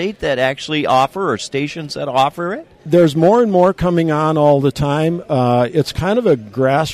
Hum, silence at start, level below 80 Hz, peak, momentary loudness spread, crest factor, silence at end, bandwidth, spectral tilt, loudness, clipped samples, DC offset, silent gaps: none; 0 s; -42 dBFS; -2 dBFS; 9 LU; 12 dB; 0 s; 14.5 kHz; -6.5 dB/octave; -15 LUFS; under 0.1%; under 0.1%; none